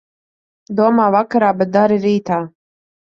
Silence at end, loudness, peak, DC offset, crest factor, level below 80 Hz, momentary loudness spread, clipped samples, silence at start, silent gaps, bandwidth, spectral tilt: 0.7 s; -15 LUFS; -2 dBFS; under 0.1%; 16 dB; -60 dBFS; 9 LU; under 0.1%; 0.7 s; none; 7 kHz; -8 dB/octave